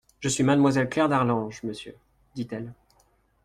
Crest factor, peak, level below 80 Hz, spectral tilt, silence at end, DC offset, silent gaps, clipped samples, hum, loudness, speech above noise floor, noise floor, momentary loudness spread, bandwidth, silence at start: 16 dB; -10 dBFS; -58 dBFS; -5.5 dB/octave; 0.7 s; under 0.1%; none; under 0.1%; none; -25 LUFS; 40 dB; -65 dBFS; 20 LU; 12.5 kHz; 0.2 s